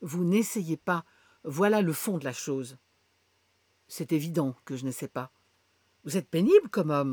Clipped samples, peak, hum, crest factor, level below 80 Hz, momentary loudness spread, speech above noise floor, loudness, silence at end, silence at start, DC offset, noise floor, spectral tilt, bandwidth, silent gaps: under 0.1%; -8 dBFS; none; 20 dB; -76 dBFS; 17 LU; 43 dB; -28 LUFS; 0 s; 0 s; under 0.1%; -70 dBFS; -6 dB/octave; over 20 kHz; none